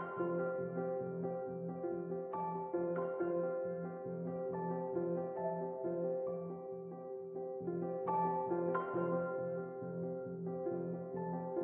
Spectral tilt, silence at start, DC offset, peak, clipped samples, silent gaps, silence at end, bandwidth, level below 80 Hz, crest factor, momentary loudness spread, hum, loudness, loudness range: -6 dB/octave; 0 s; under 0.1%; -24 dBFS; under 0.1%; none; 0 s; 3.3 kHz; -80 dBFS; 14 dB; 7 LU; none; -40 LUFS; 2 LU